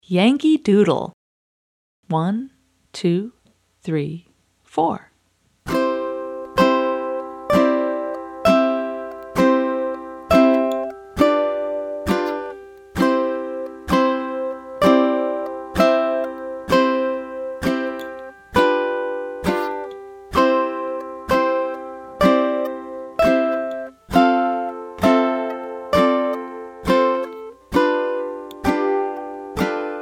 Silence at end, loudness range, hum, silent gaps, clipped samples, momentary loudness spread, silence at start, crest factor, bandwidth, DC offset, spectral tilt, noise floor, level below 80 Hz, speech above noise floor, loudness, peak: 0 s; 6 LU; none; 1.13-2.03 s; under 0.1%; 14 LU; 0.1 s; 18 dB; 16.5 kHz; under 0.1%; -6.5 dB/octave; -63 dBFS; -46 dBFS; 45 dB; -20 LUFS; -2 dBFS